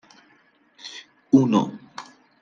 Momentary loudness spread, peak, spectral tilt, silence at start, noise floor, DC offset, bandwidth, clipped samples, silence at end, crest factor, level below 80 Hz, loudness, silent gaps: 23 LU; -4 dBFS; -7 dB/octave; 0.85 s; -60 dBFS; under 0.1%; 7.4 kHz; under 0.1%; 0.4 s; 20 dB; -74 dBFS; -20 LUFS; none